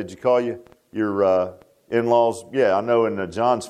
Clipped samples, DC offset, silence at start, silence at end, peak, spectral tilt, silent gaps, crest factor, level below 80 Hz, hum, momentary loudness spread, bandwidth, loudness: under 0.1%; under 0.1%; 0 s; 0 s; -6 dBFS; -6 dB/octave; none; 16 dB; -62 dBFS; none; 11 LU; 12 kHz; -21 LUFS